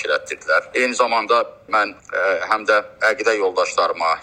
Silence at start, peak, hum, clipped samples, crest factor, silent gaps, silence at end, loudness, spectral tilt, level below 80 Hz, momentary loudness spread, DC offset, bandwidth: 0 s; 0 dBFS; none; under 0.1%; 18 dB; none; 0 s; -19 LUFS; -1.5 dB/octave; -62 dBFS; 4 LU; under 0.1%; 12 kHz